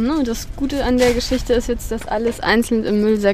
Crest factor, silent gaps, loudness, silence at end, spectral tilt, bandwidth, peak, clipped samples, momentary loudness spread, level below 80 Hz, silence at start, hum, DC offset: 16 dB; none; -19 LUFS; 0 s; -5 dB/octave; 16 kHz; -2 dBFS; under 0.1%; 8 LU; -30 dBFS; 0 s; none; under 0.1%